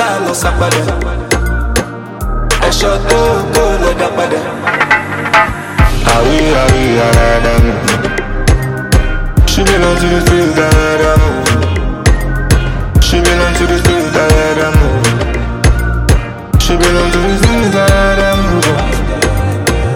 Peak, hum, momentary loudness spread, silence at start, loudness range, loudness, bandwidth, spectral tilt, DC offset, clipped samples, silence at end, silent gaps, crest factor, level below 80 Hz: 0 dBFS; none; 5 LU; 0 s; 2 LU; -11 LUFS; 17 kHz; -5 dB/octave; under 0.1%; under 0.1%; 0 s; none; 10 dB; -16 dBFS